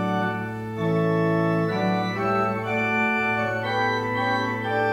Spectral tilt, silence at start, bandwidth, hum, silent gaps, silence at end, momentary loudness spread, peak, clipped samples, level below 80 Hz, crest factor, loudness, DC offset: -7 dB/octave; 0 s; 16 kHz; none; none; 0 s; 4 LU; -12 dBFS; under 0.1%; -58 dBFS; 12 dB; -24 LUFS; under 0.1%